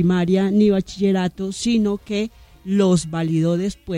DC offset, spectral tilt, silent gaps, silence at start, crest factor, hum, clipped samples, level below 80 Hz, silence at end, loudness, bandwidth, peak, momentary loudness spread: under 0.1%; -6.5 dB/octave; none; 0 s; 14 dB; none; under 0.1%; -46 dBFS; 0 s; -20 LUFS; 11 kHz; -6 dBFS; 8 LU